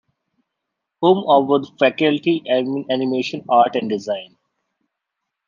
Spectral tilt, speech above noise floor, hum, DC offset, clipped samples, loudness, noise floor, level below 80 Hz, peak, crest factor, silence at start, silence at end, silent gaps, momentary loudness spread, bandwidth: -6.5 dB/octave; 62 dB; none; under 0.1%; under 0.1%; -18 LUFS; -80 dBFS; -70 dBFS; -2 dBFS; 18 dB; 1 s; 1.25 s; none; 8 LU; 7.2 kHz